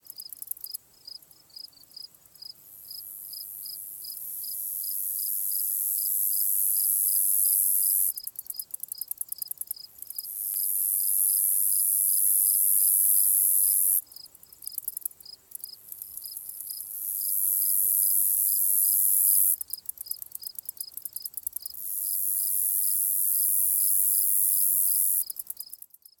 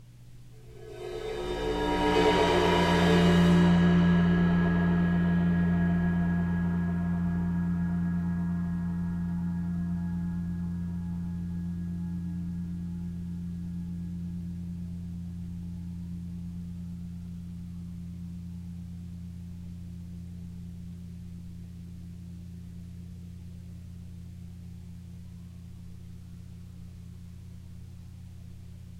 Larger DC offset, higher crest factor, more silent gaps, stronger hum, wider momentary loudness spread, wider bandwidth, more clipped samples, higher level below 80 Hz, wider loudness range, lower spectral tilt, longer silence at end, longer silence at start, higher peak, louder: neither; about the same, 20 dB vs 18 dB; neither; neither; second, 20 LU vs 23 LU; first, 19.5 kHz vs 9.6 kHz; neither; second, -78 dBFS vs -48 dBFS; second, 14 LU vs 22 LU; second, 3.5 dB/octave vs -7.5 dB/octave; first, 0.45 s vs 0 s; first, 0.2 s vs 0 s; first, -8 dBFS vs -12 dBFS; first, -22 LUFS vs -29 LUFS